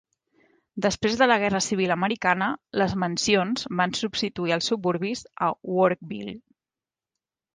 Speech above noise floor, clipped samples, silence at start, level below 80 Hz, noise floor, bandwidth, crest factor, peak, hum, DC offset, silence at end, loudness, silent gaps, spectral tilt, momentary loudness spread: over 66 dB; under 0.1%; 0.75 s; -58 dBFS; under -90 dBFS; 10 kHz; 20 dB; -6 dBFS; none; under 0.1%; 1.15 s; -24 LUFS; none; -4 dB/octave; 10 LU